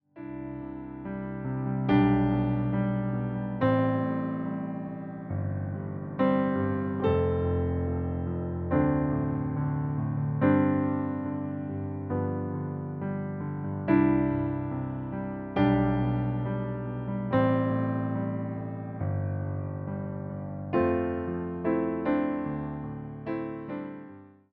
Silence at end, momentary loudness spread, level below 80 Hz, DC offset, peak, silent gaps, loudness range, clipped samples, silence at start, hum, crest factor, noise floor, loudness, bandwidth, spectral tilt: 0.25 s; 12 LU; -48 dBFS; under 0.1%; -10 dBFS; none; 4 LU; under 0.1%; 0.15 s; none; 18 dB; -49 dBFS; -29 LUFS; 4.7 kHz; -8.5 dB/octave